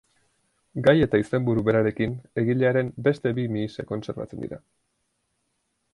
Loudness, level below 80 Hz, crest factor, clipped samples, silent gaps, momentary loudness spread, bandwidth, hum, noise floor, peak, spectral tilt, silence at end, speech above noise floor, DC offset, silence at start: -24 LUFS; -52 dBFS; 20 dB; under 0.1%; none; 14 LU; 11 kHz; none; -75 dBFS; -4 dBFS; -8.5 dB/octave; 1.35 s; 51 dB; under 0.1%; 0.75 s